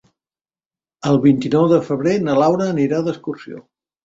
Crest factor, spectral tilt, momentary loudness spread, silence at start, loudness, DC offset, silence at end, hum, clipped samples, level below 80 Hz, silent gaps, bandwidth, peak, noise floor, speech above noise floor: 16 dB; -7.5 dB/octave; 15 LU; 1.05 s; -17 LUFS; under 0.1%; 0.45 s; none; under 0.1%; -58 dBFS; none; 7.8 kHz; -2 dBFS; under -90 dBFS; over 74 dB